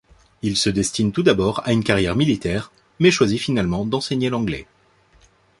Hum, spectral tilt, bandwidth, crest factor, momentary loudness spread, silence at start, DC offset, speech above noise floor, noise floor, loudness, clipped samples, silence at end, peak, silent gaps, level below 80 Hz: none; -5 dB/octave; 11.5 kHz; 18 dB; 9 LU; 0.45 s; under 0.1%; 37 dB; -56 dBFS; -20 LUFS; under 0.1%; 0.95 s; -2 dBFS; none; -44 dBFS